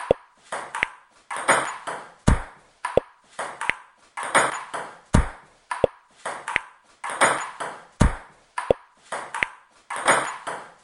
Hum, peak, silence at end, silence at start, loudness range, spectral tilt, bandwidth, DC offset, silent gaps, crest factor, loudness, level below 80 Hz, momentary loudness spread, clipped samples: none; -2 dBFS; 0.15 s; 0 s; 1 LU; -4 dB/octave; 11.5 kHz; under 0.1%; none; 24 dB; -26 LUFS; -34 dBFS; 14 LU; under 0.1%